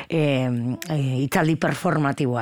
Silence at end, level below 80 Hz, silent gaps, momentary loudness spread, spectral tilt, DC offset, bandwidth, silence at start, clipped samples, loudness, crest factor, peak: 0 s; -56 dBFS; none; 4 LU; -6.5 dB/octave; under 0.1%; 19 kHz; 0 s; under 0.1%; -23 LUFS; 16 dB; -6 dBFS